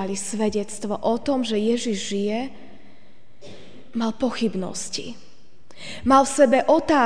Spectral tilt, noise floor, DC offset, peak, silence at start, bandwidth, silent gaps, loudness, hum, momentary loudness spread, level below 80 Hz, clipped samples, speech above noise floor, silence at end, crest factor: -4 dB/octave; -55 dBFS; 2%; -4 dBFS; 0 s; 10 kHz; none; -22 LUFS; none; 14 LU; -54 dBFS; under 0.1%; 33 dB; 0 s; 20 dB